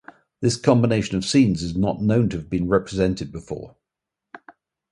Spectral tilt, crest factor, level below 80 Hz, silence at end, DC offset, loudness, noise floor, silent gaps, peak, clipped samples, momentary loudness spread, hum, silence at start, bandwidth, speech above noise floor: -6 dB/octave; 20 dB; -44 dBFS; 0.55 s; under 0.1%; -21 LUFS; -85 dBFS; none; -2 dBFS; under 0.1%; 13 LU; none; 0.4 s; 11.5 kHz; 65 dB